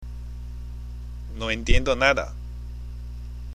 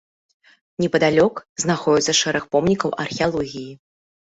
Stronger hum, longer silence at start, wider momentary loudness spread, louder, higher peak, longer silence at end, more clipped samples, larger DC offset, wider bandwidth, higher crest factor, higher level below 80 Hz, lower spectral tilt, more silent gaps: first, 60 Hz at -35 dBFS vs none; second, 0 s vs 0.8 s; first, 18 LU vs 12 LU; second, -24 LUFS vs -20 LUFS; about the same, -4 dBFS vs -4 dBFS; second, 0 s vs 0.55 s; neither; neither; first, 9.6 kHz vs 8.2 kHz; about the same, 22 dB vs 18 dB; first, -30 dBFS vs -54 dBFS; about the same, -4.5 dB/octave vs -4 dB/octave; second, none vs 1.49-1.56 s